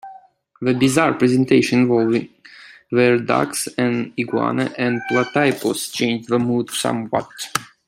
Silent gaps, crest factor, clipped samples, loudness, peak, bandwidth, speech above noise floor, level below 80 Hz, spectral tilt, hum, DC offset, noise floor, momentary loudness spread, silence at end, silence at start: none; 18 dB; under 0.1%; -19 LUFS; -2 dBFS; 16 kHz; 27 dB; -60 dBFS; -5 dB/octave; none; under 0.1%; -46 dBFS; 8 LU; 0.25 s; 0.05 s